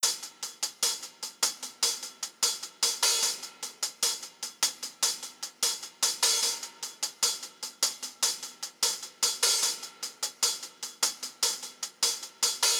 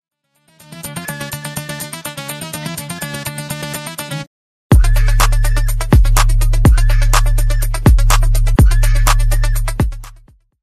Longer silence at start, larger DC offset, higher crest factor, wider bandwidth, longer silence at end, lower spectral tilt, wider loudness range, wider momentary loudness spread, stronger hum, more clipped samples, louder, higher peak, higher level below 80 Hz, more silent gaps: second, 0 s vs 0.7 s; neither; first, 22 dB vs 12 dB; first, over 20 kHz vs 15 kHz; second, 0 s vs 0.5 s; second, 3 dB/octave vs -4.5 dB/octave; second, 1 LU vs 11 LU; about the same, 12 LU vs 12 LU; neither; neither; second, -28 LUFS vs -16 LUFS; second, -10 dBFS vs 0 dBFS; second, -84 dBFS vs -14 dBFS; second, none vs 4.27-4.70 s